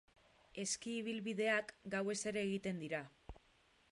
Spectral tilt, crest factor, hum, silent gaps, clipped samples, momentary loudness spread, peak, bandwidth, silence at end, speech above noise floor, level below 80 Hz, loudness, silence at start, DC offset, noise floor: -3.5 dB/octave; 20 dB; none; none; under 0.1%; 18 LU; -24 dBFS; 11.5 kHz; 0.55 s; 32 dB; -68 dBFS; -41 LUFS; 0.55 s; under 0.1%; -72 dBFS